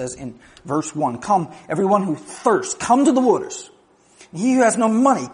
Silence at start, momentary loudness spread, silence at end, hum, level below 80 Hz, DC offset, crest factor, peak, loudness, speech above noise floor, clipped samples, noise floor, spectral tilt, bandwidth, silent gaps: 0 s; 15 LU; 0 s; none; -60 dBFS; under 0.1%; 18 dB; -2 dBFS; -19 LUFS; 31 dB; under 0.1%; -50 dBFS; -5 dB/octave; 10.5 kHz; none